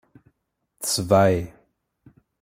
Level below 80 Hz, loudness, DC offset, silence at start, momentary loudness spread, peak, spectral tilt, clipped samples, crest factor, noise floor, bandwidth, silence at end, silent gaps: -54 dBFS; -21 LUFS; under 0.1%; 0.8 s; 13 LU; -4 dBFS; -4.5 dB/octave; under 0.1%; 22 dB; -74 dBFS; 16.5 kHz; 0.9 s; none